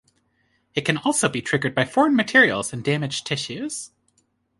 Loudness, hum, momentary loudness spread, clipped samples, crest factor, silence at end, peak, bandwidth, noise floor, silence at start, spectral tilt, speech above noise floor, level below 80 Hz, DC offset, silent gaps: -21 LUFS; none; 14 LU; under 0.1%; 20 dB; 0.7 s; -4 dBFS; 11.5 kHz; -68 dBFS; 0.75 s; -4 dB/octave; 46 dB; -60 dBFS; under 0.1%; none